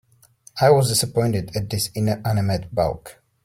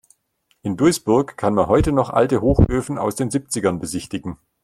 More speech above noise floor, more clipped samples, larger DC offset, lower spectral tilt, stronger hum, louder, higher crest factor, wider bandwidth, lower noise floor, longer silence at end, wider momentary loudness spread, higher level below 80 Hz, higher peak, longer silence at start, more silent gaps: second, 33 dB vs 48 dB; neither; neither; about the same, -5 dB/octave vs -6 dB/octave; neither; about the same, -21 LUFS vs -19 LUFS; about the same, 18 dB vs 18 dB; about the same, 16.5 kHz vs 15 kHz; second, -53 dBFS vs -66 dBFS; about the same, 0.3 s vs 0.3 s; second, 9 LU vs 12 LU; second, -48 dBFS vs -34 dBFS; about the same, -4 dBFS vs -2 dBFS; about the same, 0.55 s vs 0.65 s; neither